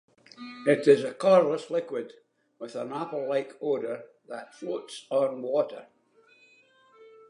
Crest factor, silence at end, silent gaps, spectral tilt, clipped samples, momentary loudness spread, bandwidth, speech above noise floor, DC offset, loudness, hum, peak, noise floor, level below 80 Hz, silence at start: 22 dB; 1.45 s; none; -6 dB/octave; under 0.1%; 21 LU; 11 kHz; 35 dB; under 0.1%; -27 LUFS; none; -6 dBFS; -62 dBFS; -86 dBFS; 0.4 s